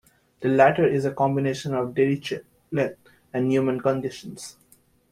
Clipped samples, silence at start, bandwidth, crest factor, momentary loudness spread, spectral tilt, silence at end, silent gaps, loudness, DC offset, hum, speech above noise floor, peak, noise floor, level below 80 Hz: under 0.1%; 0.4 s; 14.5 kHz; 20 dB; 16 LU; -6.5 dB/octave; 0.6 s; none; -24 LUFS; under 0.1%; none; 37 dB; -4 dBFS; -60 dBFS; -62 dBFS